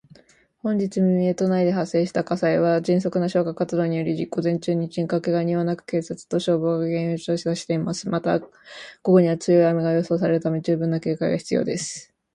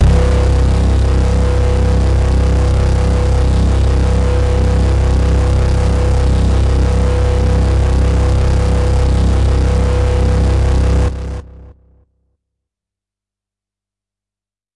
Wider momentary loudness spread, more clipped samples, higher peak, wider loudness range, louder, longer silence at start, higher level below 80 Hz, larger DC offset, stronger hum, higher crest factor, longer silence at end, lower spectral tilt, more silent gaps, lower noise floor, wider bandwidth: first, 8 LU vs 1 LU; neither; about the same, -4 dBFS vs -2 dBFS; about the same, 3 LU vs 4 LU; second, -22 LUFS vs -14 LUFS; first, 0.65 s vs 0 s; second, -62 dBFS vs -14 dBFS; neither; second, none vs 50 Hz at -45 dBFS; first, 18 dB vs 12 dB; second, 0.3 s vs 3.05 s; about the same, -7 dB/octave vs -7 dB/octave; neither; second, -56 dBFS vs -90 dBFS; about the same, 10.5 kHz vs 10.5 kHz